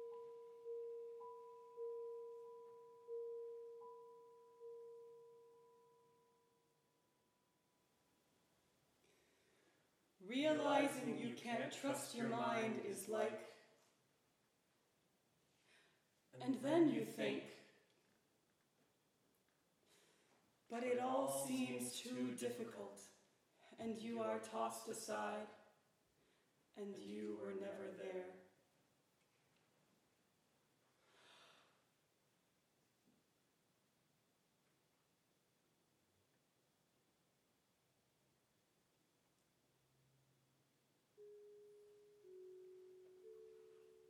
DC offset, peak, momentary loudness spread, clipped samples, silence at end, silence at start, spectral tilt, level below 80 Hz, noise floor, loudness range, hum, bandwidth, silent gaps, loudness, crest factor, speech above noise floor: under 0.1%; -26 dBFS; 24 LU; under 0.1%; 0.1 s; 0 s; -4 dB/octave; under -90 dBFS; -82 dBFS; 20 LU; none; 15 kHz; none; -45 LUFS; 24 dB; 39 dB